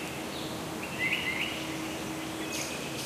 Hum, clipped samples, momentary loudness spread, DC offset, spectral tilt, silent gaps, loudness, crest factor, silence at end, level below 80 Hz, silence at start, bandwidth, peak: none; under 0.1%; 7 LU; under 0.1%; -3 dB/octave; none; -33 LUFS; 18 dB; 0 s; -58 dBFS; 0 s; 15.5 kHz; -18 dBFS